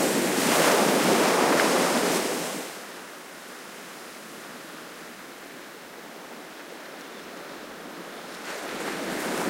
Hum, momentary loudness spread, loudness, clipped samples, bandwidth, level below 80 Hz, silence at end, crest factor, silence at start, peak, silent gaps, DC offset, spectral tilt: none; 20 LU; -23 LUFS; under 0.1%; 16 kHz; -70 dBFS; 0 s; 22 dB; 0 s; -6 dBFS; none; under 0.1%; -2.5 dB/octave